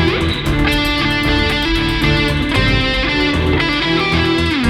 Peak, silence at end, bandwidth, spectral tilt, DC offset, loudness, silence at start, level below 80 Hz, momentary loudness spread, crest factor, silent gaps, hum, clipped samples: 0 dBFS; 0 s; 16.5 kHz; -5.5 dB/octave; under 0.1%; -15 LUFS; 0 s; -24 dBFS; 1 LU; 14 dB; none; none; under 0.1%